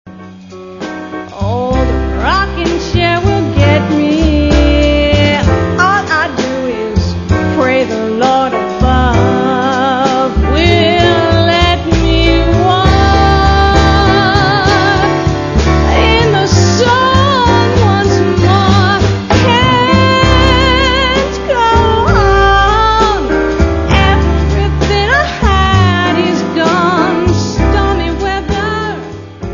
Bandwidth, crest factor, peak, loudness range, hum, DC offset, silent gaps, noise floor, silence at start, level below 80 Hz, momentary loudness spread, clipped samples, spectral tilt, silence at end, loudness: 7.4 kHz; 10 dB; 0 dBFS; 3 LU; none; under 0.1%; none; -30 dBFS; 0.05 s; -18 dBFS; 7 LU; 0.2%; -5.5 dB/octave; 0 s; -10 LUFS